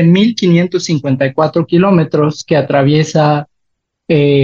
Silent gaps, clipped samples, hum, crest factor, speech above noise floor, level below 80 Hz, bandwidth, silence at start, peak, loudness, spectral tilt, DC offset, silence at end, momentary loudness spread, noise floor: none; under 0.1%; none; 10 dB; 59 dB; -52 dBFS; 7.6 kHz; 0 s; 0 dBFS; -12 LUFS; -7 dB/octave; under 0.1%; 0 s; 5 LU; -70 dBFS